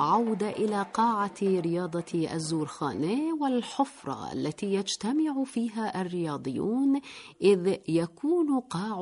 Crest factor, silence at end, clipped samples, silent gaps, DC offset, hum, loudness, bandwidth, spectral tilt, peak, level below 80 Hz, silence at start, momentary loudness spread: 18 dB; 0 s; under 0.1%; none; under 0.1%; none; -29 LUFS; 11 kHz; -6 dB/octave; -12 dBFS; -70 dBFS; 0 s; 6 LU